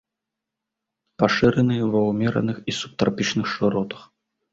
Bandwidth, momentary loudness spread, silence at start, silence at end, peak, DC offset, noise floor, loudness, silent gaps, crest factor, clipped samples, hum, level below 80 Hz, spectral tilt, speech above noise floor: 8 kHz; 9 LU; 1.2 s; 0.5 s; -2 dBFS; under 0.1%; -84 dBFS; -22 LUFS; none; 22 dB; under 0.1%; none; -52 dBFS; -6 dB/octave; 63 dB